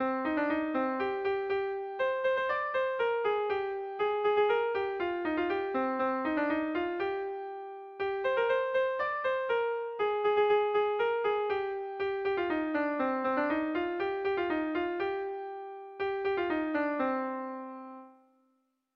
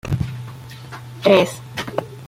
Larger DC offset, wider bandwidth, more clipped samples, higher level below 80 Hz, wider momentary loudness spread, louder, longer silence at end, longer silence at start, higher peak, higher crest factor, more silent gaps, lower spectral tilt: neither; second, 5.8 kHz vs 16 kHz; neither; second, -68 dBFS vs -44 dBFS; second, 9 LU vs 21 LU; second, -31 LUFS vs -20 LUFS; first, 0.85 s vs 0 s; about the same, 0 s vs 0.05 s; second, -18 dBFS vs -2 dBFS; second, 14 dB vs 20 dB; neither; about the same, -6.5 dB/octave vs -5.5 dB/octave